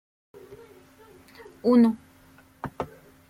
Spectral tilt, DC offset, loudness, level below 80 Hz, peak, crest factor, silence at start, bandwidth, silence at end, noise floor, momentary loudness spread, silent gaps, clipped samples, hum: -8 dB/octave; under 0.1%; -24 LUFS; -62 dBFS; -10 dBFS; 20 dB; 0.5 s; 11.5 kHz; 0.45 s; -55 dBFS; 25 LU; none; under 0.1%; none